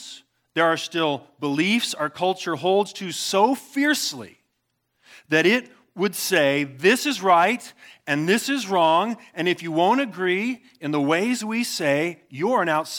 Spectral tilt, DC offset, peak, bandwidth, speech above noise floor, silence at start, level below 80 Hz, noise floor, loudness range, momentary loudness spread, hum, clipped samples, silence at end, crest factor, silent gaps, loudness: -4 dB/octave; under 0.1%; -4 dBFS; 19 kHz; 52 dB; 0 s; -80 dBFS; -74 dBFS; 3 LU; 9 LU; none; under 0.1%; 0 s; 18 dB; none; -22 LUFS